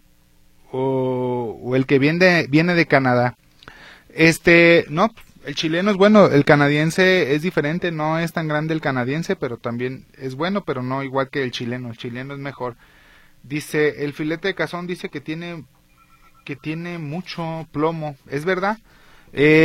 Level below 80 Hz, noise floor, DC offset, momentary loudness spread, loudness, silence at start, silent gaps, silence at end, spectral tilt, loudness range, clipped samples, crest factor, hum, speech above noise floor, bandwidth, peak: -52 dBFS; -53 dBFS; under 0.1%; 16 LU; -19 LUFS; 0.75 s; none; 0 s; -6 dB/octave; 12 LU; under 0.1%; 20 dB; none; 34 dB; 15.5 kHz; 0 dBFS